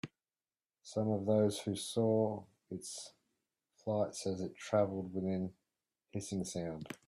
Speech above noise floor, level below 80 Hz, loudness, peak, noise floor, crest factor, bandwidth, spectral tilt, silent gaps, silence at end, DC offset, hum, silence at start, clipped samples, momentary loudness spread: over 54 dB; -74 dBFS; -37 LUFS; -18 dBFS; under -90 dBFS; 18 dB; 13.5 kHz; -6 dB/octave; none; 0.15 s; under 0.1%; none; 0.05 s; under 0.1%; 15 LU